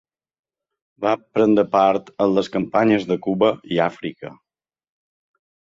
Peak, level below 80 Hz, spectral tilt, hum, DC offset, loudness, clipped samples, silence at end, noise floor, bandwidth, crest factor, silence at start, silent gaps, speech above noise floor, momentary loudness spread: -2 dBFS; -60 dBFS; -7 dB/octave; none; under 0.1%; -19 LUFS; under 0.1%; 1.3 s; under -90 dBFS; 7.6 kHz; 18 dB; 1 s; none; over 71 dB; 12 LU